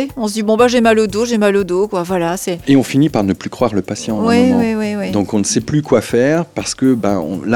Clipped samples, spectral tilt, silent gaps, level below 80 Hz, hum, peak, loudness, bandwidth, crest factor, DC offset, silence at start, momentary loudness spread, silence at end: under 0.1%; -5.5 dB/octave; none; -46 dBFS; none; 0 dBFS; -15 LUFS; 18 kHz; 14 dB; under 0.1%; 0 s; 7 LU; 0 s